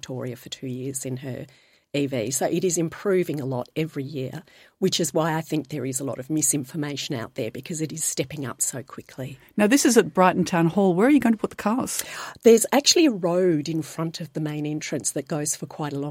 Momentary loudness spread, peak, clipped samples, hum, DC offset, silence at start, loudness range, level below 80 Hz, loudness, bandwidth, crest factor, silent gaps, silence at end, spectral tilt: 15 LU; -2 dBFS; under 0.1%; none; under 0.1%; 0.05 s; 7 LU; -64 dBFS; -23 LUFS; 16.5 kHz; 22 dB; none; 0 s; -4 dB/octave